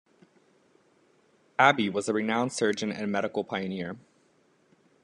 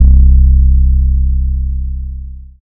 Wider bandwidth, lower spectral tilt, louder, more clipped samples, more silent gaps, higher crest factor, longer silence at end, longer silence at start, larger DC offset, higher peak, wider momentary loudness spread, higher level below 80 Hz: first, 11 kHz vs 0.5 kHz; second, -4.5 dB/octave vs -15 dB/octave; second, -27 LUFS vs -12 LUFS; second, under 0.1% vs 2%; neither; first, 26 dB vs 10 dB; first, 1.05 s vs 0.35 s; first, 1.6 s vs 0 s; neither; second, -4 dBFS vs 0 dBFS; second, 14 LU vs 17 LU; second, -76 dBFS vs -10 dBFS